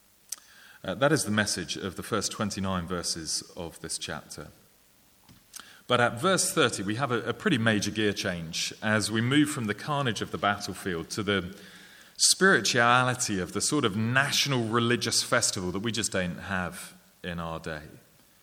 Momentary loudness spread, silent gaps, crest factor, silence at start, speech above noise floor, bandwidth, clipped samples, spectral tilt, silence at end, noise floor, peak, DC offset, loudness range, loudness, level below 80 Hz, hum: 18 LU; none; 22 dB; 0.3 s; 33 dB; 19.5 kHz; under 0.1%; -3.5 dB/octave; 0.45 s; -61 dBFS; -6 dBFS; under 0.1%; 8 LU; -27 LUFS; -60 dBFS; none